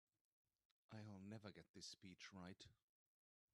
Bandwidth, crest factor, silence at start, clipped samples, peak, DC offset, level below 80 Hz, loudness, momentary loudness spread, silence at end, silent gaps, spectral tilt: 11.5 kHz; 20 dB; 0.9 s; under 0.1%; -44 dBFS; under 0.1%; under -90 dBFS; -60 LUFS; 6 LU; 0.8 s; 1.69-1.74 s; -4.5 dB/octave